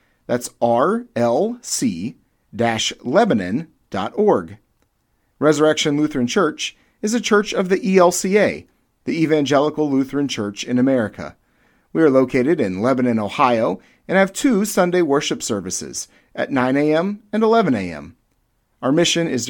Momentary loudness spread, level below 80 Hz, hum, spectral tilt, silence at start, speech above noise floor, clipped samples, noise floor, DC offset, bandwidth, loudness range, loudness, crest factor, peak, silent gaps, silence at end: 11 LU; -56 dBFS; none; -4.5 dB/octave; 0.3 s; 48 dB; under 0.1%; -66 dBFS; under 0.1%; 18 kHz; 3 LU; -19 LUFS; 18 dB; -2 dBFS; none; 0 s